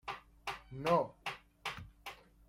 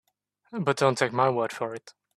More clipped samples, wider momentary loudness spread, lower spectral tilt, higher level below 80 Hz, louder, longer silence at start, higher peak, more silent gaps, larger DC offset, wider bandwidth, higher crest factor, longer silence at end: neither; first, 17 LU vs 13 LU; about the same, -5 dB/octave vs -5 dB/octave; first, -64 dBFS vs -70 dBFS; second, -39 LUFS vs -26 LUFS; second, 0.05 s vs 0.5 s; second, -18 dBFS vs -6 dBFS; neither; neither; first, 16 kHz vs 13.5 kHz; about the same, 22 dB vs 22 dB; about the same, 0.35 s vs 0.25 s